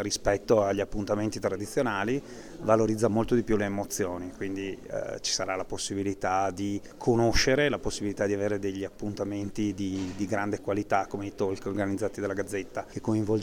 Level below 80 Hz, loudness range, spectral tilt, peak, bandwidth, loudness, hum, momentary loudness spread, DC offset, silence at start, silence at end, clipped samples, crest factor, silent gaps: -46 dBFS; 3 LU; -5 dB/octave; -8 dBFS; 18.5 kHz; -29 LUFS; none; 10 LU; under 0.1%; 0 s; 0 s; under 0.1%; 20 dB; none